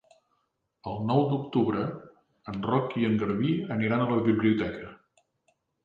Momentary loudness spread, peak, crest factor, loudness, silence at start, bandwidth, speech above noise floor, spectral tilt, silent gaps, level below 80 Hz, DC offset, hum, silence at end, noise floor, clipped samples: 16 LU; -12 dBFS; 18 dB; -27 LUFS; 0.85 s; 5.2 kHz; 50 dB; -9.5 dB/octave; none; -60 dBFS; under 0.1%; none; 0.9 s; -76 dBFS; under 0.1%